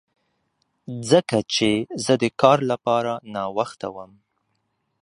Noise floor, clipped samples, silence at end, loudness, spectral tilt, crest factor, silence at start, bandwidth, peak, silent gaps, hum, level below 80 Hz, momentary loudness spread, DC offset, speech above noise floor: -73 dBFS; under 0.1%; 1 s; -21 LUFS; -5 dB/octave; 22 dB; 0.9 s; 11.5 kHz; 0 dBFS; none; none; -62 dBFS; 16 LU; under 0.1%; 51 dB